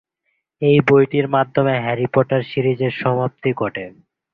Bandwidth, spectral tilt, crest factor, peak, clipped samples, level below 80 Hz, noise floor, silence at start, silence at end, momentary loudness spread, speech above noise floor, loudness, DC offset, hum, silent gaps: 5.2 kHz; -9 dB/octave; 16 dB; -2 dBFS; under 0.1%; -54 dBFS; -72 dBFS; 0.6 s; 0.45 s; 9 LU; 55 dB; -18 LUFS; under 0.1%; none; none